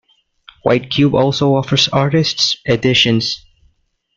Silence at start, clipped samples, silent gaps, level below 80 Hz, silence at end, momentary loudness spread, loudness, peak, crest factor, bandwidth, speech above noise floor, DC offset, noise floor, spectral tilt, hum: 0.65 s; under 0.1%; none; -46 dBFS; 0.8 s; 6 LU; -14 LUFS; 0 dBFS; 16 dB; 7.6 kHz; 46 dB; under 0.1%; -60 dBFS; -5 dB/octave; none